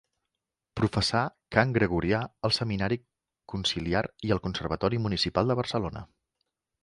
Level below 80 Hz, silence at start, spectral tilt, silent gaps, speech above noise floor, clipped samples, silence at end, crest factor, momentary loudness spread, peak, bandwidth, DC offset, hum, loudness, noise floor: -48 dBFS; 0.75 s; -5.5 dB/octave; none; 59 dB; under 0.1%; 0.8 s; 24 dB; 7 LU; -4 dBFS; 11.5 kHz; under 0.1%; none; -28 LUFS; -86 dBFS